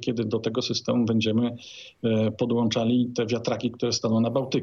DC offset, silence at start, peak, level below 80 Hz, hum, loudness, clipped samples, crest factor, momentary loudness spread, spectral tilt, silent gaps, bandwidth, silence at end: under 0.1%; 0 s; -12 dBFS; -66 dBFS; none; -25 LUFS; under 0.1%; 14 dB; 5 LU; -5.5 dB/octave; none; 7.4 kHz; 0 s